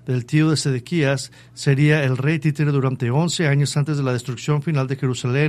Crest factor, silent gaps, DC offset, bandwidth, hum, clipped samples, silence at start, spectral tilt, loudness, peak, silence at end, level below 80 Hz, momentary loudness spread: 16 dB; none; under 0.1%; 12.5 kHz; none; under 0.1%; 0.05 s; -6 dB/octave; -20 LUFS; -4 dBFS; 0 s; -56 dBFS; 6 LU